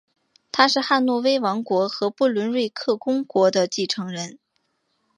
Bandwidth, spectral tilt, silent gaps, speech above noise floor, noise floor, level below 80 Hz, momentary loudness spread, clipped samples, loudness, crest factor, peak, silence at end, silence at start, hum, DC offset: 11 kHz; -4 dB/octave; none; 50 dB; -71 dBFS; -74 dBFS; 8 LU; under 0.1%; -21 LUFS; 22 dB; -2 dBFS; 0.8 s; 0.55 s; none; under 0.1%